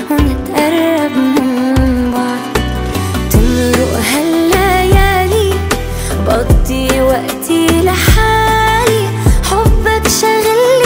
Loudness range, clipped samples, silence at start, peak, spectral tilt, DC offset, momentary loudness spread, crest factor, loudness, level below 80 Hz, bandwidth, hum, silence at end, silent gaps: 2 LU; under 0.1%; 0 s; 0 dBFS; -5 dB/octave; under 0.1%; 6 LU; 10 dB; -12 LUFS; -18 dBFS; 16.5 kHz; none; 0 s; none